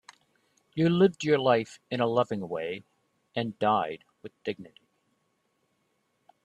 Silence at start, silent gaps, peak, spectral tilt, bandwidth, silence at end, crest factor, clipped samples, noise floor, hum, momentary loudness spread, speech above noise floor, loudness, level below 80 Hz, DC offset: 0.75 s; none; -10 dBFS; -6.5 dB/octave; 10 kHz; 1.8 s; 20 dB; under 0.1%; -74 dBFS; none; 17 LU; 47 dB; -28 LUFS; -70 dBFS; under 0.1%